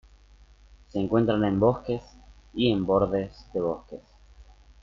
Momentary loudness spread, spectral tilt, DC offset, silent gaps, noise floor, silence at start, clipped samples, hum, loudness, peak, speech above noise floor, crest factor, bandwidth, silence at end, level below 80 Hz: 14 LU; -8.5 dB/octave; under 0.1%; none; -54 dBFS; 0.95 s; under 0.1%; 50 Hz at -50 dBFS; -26 LUFS; -8 dBFS; 29 dB; 20 dB; 7.2 kHz; 0.4 s; -50 dBFS